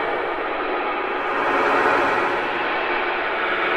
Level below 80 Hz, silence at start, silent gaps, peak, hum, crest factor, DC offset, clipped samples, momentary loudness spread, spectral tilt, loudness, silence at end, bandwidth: -50 dBFS; 0 s; none; -6 dBFS; none; 16 dB; under 0.1%; under 0.1%; 6 LU; -4.5 dB/octave; -21 LUFS; 0 s; 13.5 kHz